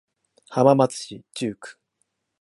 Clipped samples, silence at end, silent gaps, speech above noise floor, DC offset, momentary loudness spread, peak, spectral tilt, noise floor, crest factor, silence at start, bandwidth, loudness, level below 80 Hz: under 0.1%; 0.7 s; none; 53 dB; under 0.1%; 21 LU; -2 dBFS; -6 dB/octave; -74 dBFS; 22 dB; 0.5 s; 11.5 kHz; -22 LUFS; -70 dBFS